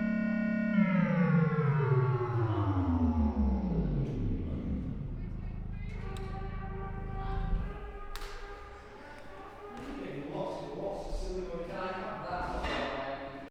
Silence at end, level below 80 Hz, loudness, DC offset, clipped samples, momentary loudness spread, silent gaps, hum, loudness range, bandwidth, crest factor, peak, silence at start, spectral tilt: 0 s; -40 dBFS; -33 LUFS; under 0.1%; under 0.1%; 17 LU; none; none; 13 LU; 10 kHz; 16 dB; -16 dBFS; 0 s; -8.5 dB/octave